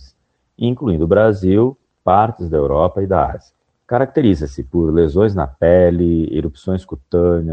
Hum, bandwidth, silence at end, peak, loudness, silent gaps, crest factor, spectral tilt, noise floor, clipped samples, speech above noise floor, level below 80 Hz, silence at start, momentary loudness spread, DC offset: none; 8.2 kHz; 0 s; 0 dBFS; -16 LUFS; none; 16 dB; -9.5 dB/octave; -61 dBFS; under 0.1%; 46 dB; -34 dBFS; 0.6 s; 9 LU; under 0.1%